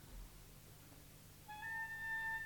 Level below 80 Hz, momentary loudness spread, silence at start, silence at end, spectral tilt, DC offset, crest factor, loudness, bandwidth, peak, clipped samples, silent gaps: -62 dBFS; 17 LU; 0 s; 0 s; -2.5 dB/octave; under 0.1%; 12 dB; -45 LUFS; 19 kHz; -36 dBFS; under 0.1%; none